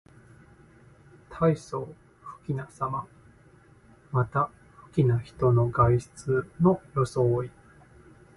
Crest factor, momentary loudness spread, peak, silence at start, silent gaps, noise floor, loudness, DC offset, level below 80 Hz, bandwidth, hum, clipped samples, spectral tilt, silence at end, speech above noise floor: 20 dB; 18 LU; -8 dBFS; 1.3 s; none; -56 dBFS; -27 LUFS; under 0.1%; -52 dBFS; 11.5 kHz; none; under 0.1%; -8.5 dB/octave; 0.9 s; 31 dB